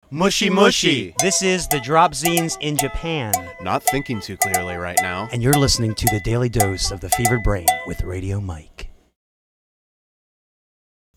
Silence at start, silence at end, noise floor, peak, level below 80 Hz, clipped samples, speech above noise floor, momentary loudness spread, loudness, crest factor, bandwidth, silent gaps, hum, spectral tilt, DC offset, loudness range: 0.1 s; 2.25 s; under -90 dBFS; 0 dBFS; -36 dBFS; under 0.1%; over 70 dB; 10 LU; -19 LUFS; 20 dB; over 20 kHz; none; none; -3.5 dB/octave; under 0.1%; 8 LU